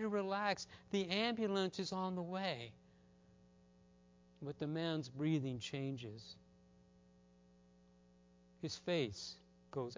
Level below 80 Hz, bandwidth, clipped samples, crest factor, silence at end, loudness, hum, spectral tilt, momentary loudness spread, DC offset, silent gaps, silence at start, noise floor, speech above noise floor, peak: -74 dBFS; 7.6 kHz; under 0.1%; 20 dB; 0 s; -41 LUFS; 60 Hz at -70 dBFS; -5.5 dB/octave; 14 LU; under 0.1%; none; 0 s; -68 dBFS; 27 dB; -22 dBFS